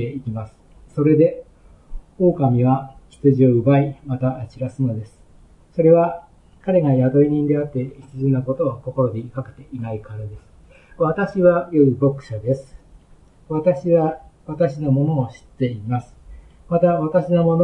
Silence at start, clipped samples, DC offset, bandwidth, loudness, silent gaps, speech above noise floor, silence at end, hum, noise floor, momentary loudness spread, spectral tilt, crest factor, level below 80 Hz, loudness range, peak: 0 s; under 0.1%; under 0.1%; 6 kHz; -19 LUFS; none; 31 dB; 0 s; none; -49 dBFS; 16 LU; -10.5 dB/octave; 18 dB; -46 dBFS; 4 LU; -2 dBFS